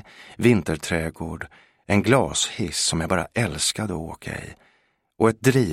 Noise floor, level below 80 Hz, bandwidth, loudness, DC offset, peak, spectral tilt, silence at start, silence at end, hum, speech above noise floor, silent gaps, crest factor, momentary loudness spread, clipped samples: -65 dBFS; -46 dBFS; 16 kHz; -23 LUFS; under 0.1%; -2 dBFS; -4.5 dB/octave; 0.2 s; 0 s; none; 42 dB; none; 22 dB; 15 LU; under 0.1%